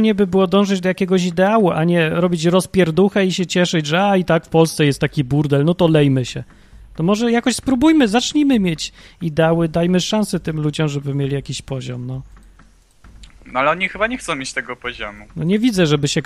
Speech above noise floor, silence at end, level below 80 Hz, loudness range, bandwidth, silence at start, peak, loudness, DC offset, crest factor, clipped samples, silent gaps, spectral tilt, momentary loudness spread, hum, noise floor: 32 dB; 0 s; -44 dBFS; 7 LU; 14.5 kHz; 0 s; 0 dBFS; -17 LUFS; under 0.1%; 16 dB; under 0.1%; none; -5.5 dB/octave; 12 LU; none; -49 dBFS